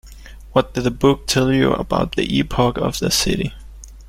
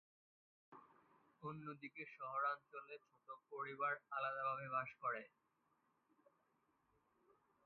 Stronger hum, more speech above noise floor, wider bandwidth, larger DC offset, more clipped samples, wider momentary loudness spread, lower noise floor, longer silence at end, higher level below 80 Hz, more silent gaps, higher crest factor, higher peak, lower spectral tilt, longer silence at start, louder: neither; second, 20 dB vs 36 dB; first, 16.5 kHz vs 4.5 kHz; neither; neither; second, 5 LU vs 19 LU; second, -38 dBFS vs -83 dBFS; second, 0 s vs 2.4 s; first, -34 dBFS vs under -90 dBFS; neither; about the same, 18 dB vs 20 dB; first, -2 dBFS vs -30 dBFS; about the same, -4.5 dB/octave vs -3.5 dB/octave; second, 0.05 s vs 0.7 s; first, -18 LUFS vs -46 LUFS